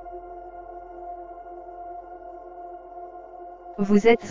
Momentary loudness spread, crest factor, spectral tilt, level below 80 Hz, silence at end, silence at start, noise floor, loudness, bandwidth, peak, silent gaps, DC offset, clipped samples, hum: 22 LU; 22 dB; -6.5 dB/octave; -54 dBFS; 0 s; 0.05 s; -42 dBFS; -23 LUFS; 7.6 kHz; -4 dBFS; none; under 0.1%; under 0.1%; none